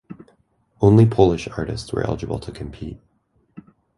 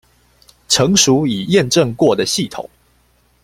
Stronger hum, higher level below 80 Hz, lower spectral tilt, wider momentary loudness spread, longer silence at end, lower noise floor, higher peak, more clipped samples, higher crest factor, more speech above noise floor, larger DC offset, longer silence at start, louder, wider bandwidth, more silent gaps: second, none vs 60 Hz at -40 dBFS; first, -40 dBFS vs -48 dBFS; first, -8 dB/octave vs -3.5 dB/octave; first, 20 LU vs 13 LU; second, 0.35 s vs 0.75 s; first, -61 dBFS vs -56 dBFS; about the same, -2 dBFS vs 0 dBFS; neither; about the same, 20 dB vs 16 dB; about the same, 43 dB vs 42 dB; neither; second, 0.1 s vs 0.7 s; second, -19 LUFS vs -14 LUFS; second, 11.5 kHz vs 16 kHz; neither